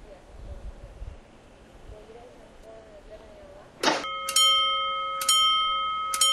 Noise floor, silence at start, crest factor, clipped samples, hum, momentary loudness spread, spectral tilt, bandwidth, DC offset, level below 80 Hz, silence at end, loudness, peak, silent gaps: -51 dBFS; 0 s; 22 dB; under 0.1%; none; 26 LU; 0 dB/octave; 16 kHz; under 0.1%; -48 dBFS; 0 s; -22 LUFS; -8 dBFS; none